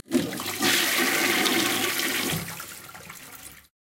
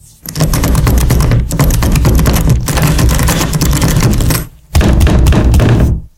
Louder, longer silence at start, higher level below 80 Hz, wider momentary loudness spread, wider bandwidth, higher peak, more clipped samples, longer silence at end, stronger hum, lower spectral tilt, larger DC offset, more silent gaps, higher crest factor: second, -23 LUFS vs -11 LUFS; second, 0.1 s vs 0.25 s; second, -62 dBFS vs -12 dBFS; first, 20 LU vs 4 LU; about the same, 17 kHz vs 17.5 kHz; second, -4 dBFS vs 0 dBFS; neither; first, 0.4 s vs 0.1 s; neither; second, -2 dB/octave vs -5.5 dB/octave; neither; neither; first, 24 dB vs 10 dB